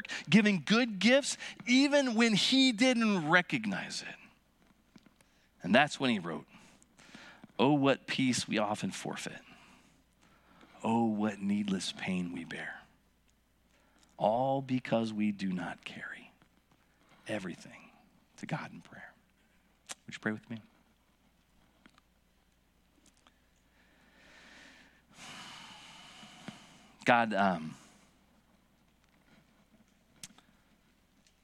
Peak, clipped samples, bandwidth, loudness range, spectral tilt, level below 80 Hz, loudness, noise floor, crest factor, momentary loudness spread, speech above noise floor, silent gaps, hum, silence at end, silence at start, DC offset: -8 dBFS; under 0.1%; 12.5 kHz; 18 LU; -4.5 dB/octave; -74 dBFS; -31 LUFS; -70 dBFS; 26 dB; 24 LU; 39 dB; none; none; 1.15 s; 0.1 s; under 0.1%